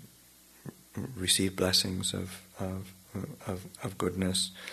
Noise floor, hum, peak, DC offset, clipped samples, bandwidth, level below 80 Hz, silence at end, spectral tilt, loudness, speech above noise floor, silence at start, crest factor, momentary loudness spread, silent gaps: -58 dBFS; none; -12 dBFS; under 0.1%; under 0.1%; 13.5 kHz; -62 dBFS; 0 s; -3 dB/octave; -31 LUFS; 26 dB; 0 s; 22 dB; 17 LU; none